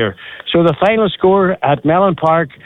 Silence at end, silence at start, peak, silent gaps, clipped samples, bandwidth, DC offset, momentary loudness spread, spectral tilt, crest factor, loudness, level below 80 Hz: 0.2 s; 0 s; -2 dBFS; none; under 0.1%; 5.2 kHz; under 0.1%; 5 LU; -8.5 dB/octave; 12 dB; -13 LUFS; -46 dBFS